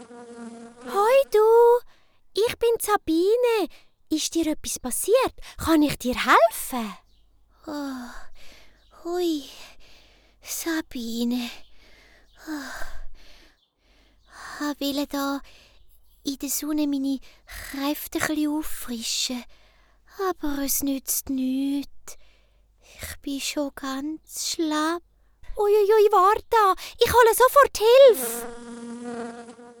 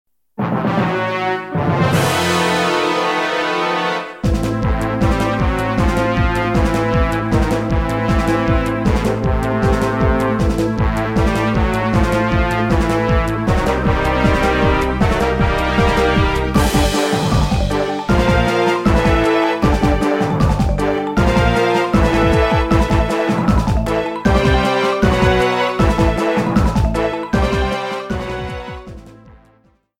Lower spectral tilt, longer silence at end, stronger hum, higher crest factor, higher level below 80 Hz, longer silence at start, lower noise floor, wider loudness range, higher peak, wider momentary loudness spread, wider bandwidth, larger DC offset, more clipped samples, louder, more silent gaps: second, -3 dB/octave vs -6 dB/octave; second, 0.1 s vs 0.9 s; neither; about the same, 20 dB vs 16 dB; second, -48 dBFS vs -22 dBFS; second, 0 s vs 0.4 s; first, -62 dBFS vs -55 dBFS; first, 14 LU vs 2 LU; second, -4 dBFS vs 0 dBFS; first, 21 LU vs 5 LU; first, over 20 kHz vs 16.5 kHz; neither; neither; second, -23 LUFS vs -16 LUFS; neither